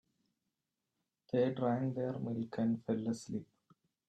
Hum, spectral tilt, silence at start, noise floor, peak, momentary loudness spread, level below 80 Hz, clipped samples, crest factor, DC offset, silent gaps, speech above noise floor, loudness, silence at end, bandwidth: none; -7.5 dB/octave; 1.35 s; -88 dBFS; -20 dBFS; 7 LU; -78 dBFS; under 0.1%; 18 dB; under 0.1%; none; 53 dB; -37 LUFS; 0.65 s; 9.2 kHz